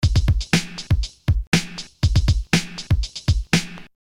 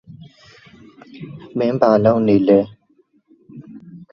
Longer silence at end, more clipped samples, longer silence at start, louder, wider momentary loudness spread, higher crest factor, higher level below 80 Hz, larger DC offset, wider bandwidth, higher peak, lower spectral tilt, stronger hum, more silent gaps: about the same, 0.2 s vs 0.15 s; neither; second, 0 s vs 1.15 s; second, -22 LUFS vs -16 LUFS; second, 5 LU vs 26 LU; about the same, 16 dB vs 20 dB; first, -26 dBFS vs -58 dBFS; neither; first, 16 kHz vs 6.6 kHz; second, -6 dBFS vs 0 dBFS; second, -4.5 dB/octave vs -9.5 dB/octave; neither; first, 1.47-1.52 s vs none